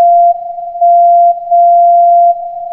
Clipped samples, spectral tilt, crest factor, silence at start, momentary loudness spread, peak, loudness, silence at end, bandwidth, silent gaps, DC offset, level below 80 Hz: under 0.1%; -8 dB/octave; 6 dB; 0 s; 10 LU; -2 dBFS; -8 LUFS; 0 s; 0.9 kHz; none; under 0.1%; -58 dBFS